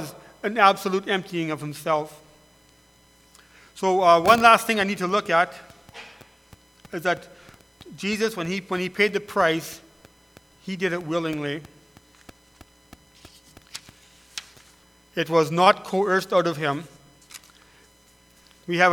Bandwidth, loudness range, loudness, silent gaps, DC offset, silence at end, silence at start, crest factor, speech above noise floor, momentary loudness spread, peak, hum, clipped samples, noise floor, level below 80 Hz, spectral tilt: 19 kHz; 11 LU; -22 LUFS; none; under 0.1%; 0 s; 0 s; 26 dB; 34 dB; 24 LU; 0 dBFS; none; under 0.1%; -56 dBFS; -62 dBFS; -4.5 dB/octave